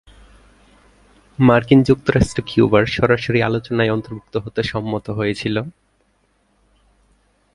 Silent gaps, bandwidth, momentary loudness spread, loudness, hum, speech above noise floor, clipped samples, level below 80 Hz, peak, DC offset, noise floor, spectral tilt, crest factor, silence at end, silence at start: none; 11.5 kHz; 12 LU; -18 LUFS; 50 Hz at -50 dBFS; 45 dB; under 0.1%; -40 dBFS; 0 dBFS; under 0.1%; -62 dBFS; -7 dB/octave; 18 dB; 1.85 s; 1.4 s